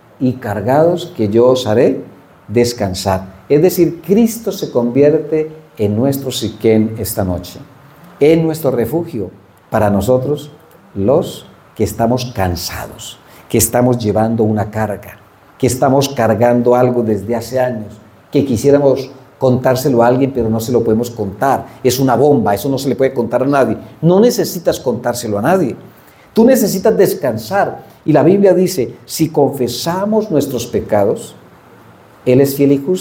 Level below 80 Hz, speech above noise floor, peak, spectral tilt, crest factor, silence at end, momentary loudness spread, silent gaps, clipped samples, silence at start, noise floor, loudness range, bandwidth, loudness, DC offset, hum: -48 dBFS; 28 dB; 0 dBFS; -6 dB/octave; 14 dB; 0 s; 10 LU; none; under 0.1%; 0.2 s; -42 dBFS; 3 LU; 17.5 kHz; -14 LUFS; under 0.1%; none